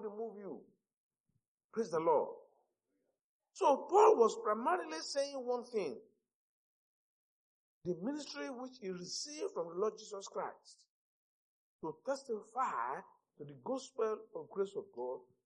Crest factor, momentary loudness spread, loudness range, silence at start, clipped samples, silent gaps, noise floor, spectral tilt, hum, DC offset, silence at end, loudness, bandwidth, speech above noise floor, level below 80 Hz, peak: 22 dB; 16 LU; 11 LU; 0 s; under 0.1%; 0.97-1.11 s, 1.20-1.24 s, 1.48-1.58 s, 1.64-1.69 s, 3.21-3.40 s, 6.34-7.81 s, 10.89-11.79 s; -85 dBFS; -4 dB/octave; none; under 0.1%; 0.2 s; -37 LUFS; 10.5 kHz; 48 dB; under -90 dBFS; -16 dBFS